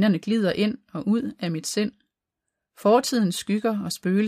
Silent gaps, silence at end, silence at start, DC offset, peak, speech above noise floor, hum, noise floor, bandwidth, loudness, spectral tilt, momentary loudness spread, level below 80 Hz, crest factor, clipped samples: none; 0 s; 0 s; under 0.1%; -6 dBFS; 61 dB; none; -84 dBFS; 15.5 kHz; -24 LUFS; -5.5 dB/octave; 8 LU; -66 dBFS; 18 dB; under 0.1%